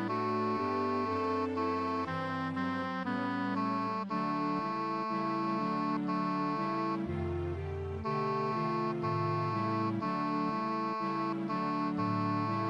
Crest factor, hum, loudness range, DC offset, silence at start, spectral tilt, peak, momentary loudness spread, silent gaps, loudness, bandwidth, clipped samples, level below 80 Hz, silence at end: 12 dB; none; 1 LU; under 0.1%; 0 s; -8 dB/octave; -20 dBFS; 3 LU; none; -33 LUFS; 11 kHz; under 0.1%; -60 dBFS; 0 s